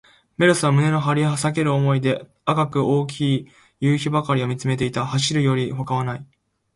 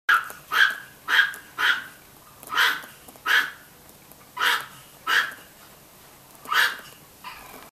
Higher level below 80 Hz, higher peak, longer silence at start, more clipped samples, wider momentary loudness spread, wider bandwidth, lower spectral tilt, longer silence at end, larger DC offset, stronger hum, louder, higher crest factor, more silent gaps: first, -56 dBFS vs -66 dBFS; about the same, -4 dBFS vs -4 dBFS; first, 0.4 s vs 0.1 s; neither; second, 7 LU vs 21 LU; second, 11.5 kHz vs 15.5 kHz; first, -6 dB/octave vs 0.5 dB/octave; first, 0.5 s vs 0.05 s; neither; neither; about the same, -21 LUFS vs -23 LUFS; second, 16 dB vs 22 dB; neither